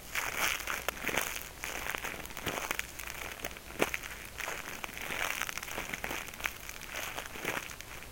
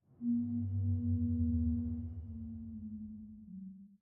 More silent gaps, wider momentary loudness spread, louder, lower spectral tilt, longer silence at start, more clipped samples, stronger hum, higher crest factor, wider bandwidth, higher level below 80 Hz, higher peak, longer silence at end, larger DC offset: neither; second, 8 LU vs 16 LU; about the same, -36 LUFS vs -37 LUFS; second, -1.5 dB/octave vs -15.5 dB/octave; second, 0 s vs 0.2 s; neither; neither; first, 30 dB vs 12 dB; first, 17 kHz vs 1.1 kHz; about the same, -54 dBFS vs -52 dBFS; first, -8 dBFS vs -24 dBFS; about the same, 0 s vs 0.05 s; neither